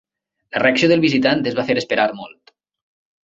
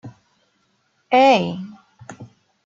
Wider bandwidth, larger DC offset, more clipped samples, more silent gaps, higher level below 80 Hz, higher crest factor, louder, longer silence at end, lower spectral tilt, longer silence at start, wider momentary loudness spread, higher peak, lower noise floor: about the same, 7.8 kHz vs 7.8 kHz; neither; neither; neither; first, -58 dBFS vs -70 dBFS; about the same, 18 dB vs 20 dB; about the same, -17 LUFS vs -16 LUFS; first, 1 s vs 0.4 s; about the same, -5.5 dB/octave vs -5.5 dB/octave; first, 0.55 s vs 0.05 s; second, 8 LU vs 26 LU; about the same, -2 dBFS vs -2 dBFS; second, -44 dBFS vs -66 dBFS